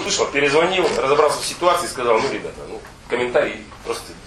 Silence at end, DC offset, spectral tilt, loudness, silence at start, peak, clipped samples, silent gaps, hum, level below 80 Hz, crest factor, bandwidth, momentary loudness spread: 0 s; under 0.1%; -3 dB/octave; -19 LUFS; 0 s; -2 dBFS; under 0.1%; none; none; -48 dBFS; 18 dB; 13 kHz; 15 LU